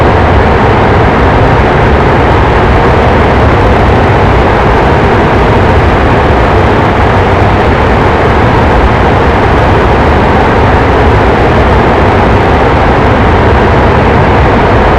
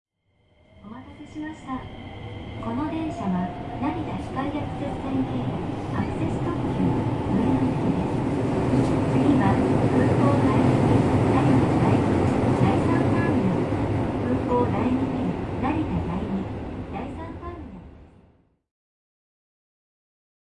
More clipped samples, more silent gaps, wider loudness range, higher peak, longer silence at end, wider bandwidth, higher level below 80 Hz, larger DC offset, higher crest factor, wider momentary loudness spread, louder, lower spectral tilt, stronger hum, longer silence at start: first, 5% vs under 0.1%; neither; second, 0 LU vs 13 LU; first, 0 dBFS vs -6 dBFS; second, 0 s vs 2.4 s; second, 9.6 kHz vs 11 kHz; first, -14 dBFS vs -42 dBFS; neither; second, 6 dB vs 16 dB; second, 1 LU vs 16 LU; first, -6 LUFS vs -24 LUFS; about the same, -7.5 dB/octave vs -8.5 dB/octave; neither; second, 0 s vs 0.85 s